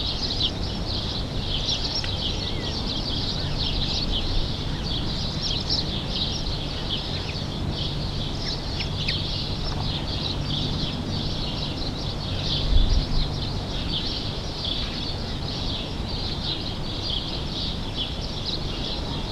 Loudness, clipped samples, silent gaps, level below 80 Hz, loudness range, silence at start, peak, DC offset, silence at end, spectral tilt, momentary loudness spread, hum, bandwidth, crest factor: -27 LUFS; under 0.1%; none; -30 dBFS; 2 LU; 0 s; -8 dBFS; under 0.1%; 0 s; -5 dB/octave; 5 LU; none; 12.5 kHz; 18 dB